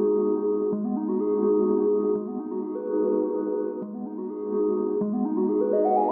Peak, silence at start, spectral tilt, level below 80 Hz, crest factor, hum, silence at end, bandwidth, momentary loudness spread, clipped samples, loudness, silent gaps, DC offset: -12 dBFS; 0 s; -14 dB/octave; -74 dBFS; 14 dB; none; 0 s; 2.2 kHz; 9 LU; under 0.1%; -26 LUFS; none; under 0.1%